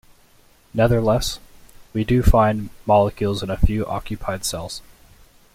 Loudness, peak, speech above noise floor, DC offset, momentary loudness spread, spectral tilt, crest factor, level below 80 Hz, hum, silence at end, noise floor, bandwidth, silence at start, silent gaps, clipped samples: -21 LUFS; -2 dBFS; 35 dB; under 0.1%; 13 LU; -6 dB/octave; 18 dB; -28 dBFS; none; 0.75 s; -53 dBFS; 16.5 kHz; 0.75 s; none; under 0.1%